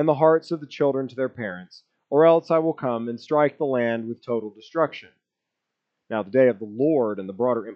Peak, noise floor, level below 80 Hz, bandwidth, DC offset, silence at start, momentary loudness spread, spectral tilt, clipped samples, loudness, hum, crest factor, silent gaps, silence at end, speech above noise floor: -4 dBFS; -83 dBFS; -84 dBFS; 7 kHz; under 0.1%; 0 s; 12 LU; -8 dB/octave; under 0.1%; -23 LUFS; none; 18 dB; none; 0 s; 61 dB